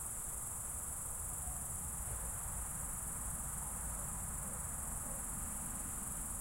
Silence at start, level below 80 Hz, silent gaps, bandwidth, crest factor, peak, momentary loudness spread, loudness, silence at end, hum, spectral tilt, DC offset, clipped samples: 0 s; -50 dBFS; none; 16.5 kHz; 14 dB; -28 dBFS; 0 LU; -40 LUFS; 0 s; none; -3 dB/octave; under 0.1%; under 0.1%